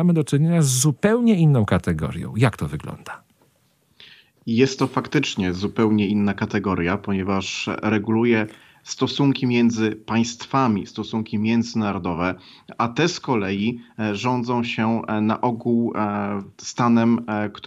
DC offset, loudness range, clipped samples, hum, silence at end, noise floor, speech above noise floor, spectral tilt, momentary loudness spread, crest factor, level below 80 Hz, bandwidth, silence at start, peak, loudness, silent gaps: under 0.1%; 3 LU; under 0.1%; none; 0 s; -63 dBFS; 42 dB; -5.5 dB/octave; 10 LU; 18 dB; -52 dBFS; 14.5 kHz; 0 s; -4 dBFS; -21 LUFS; none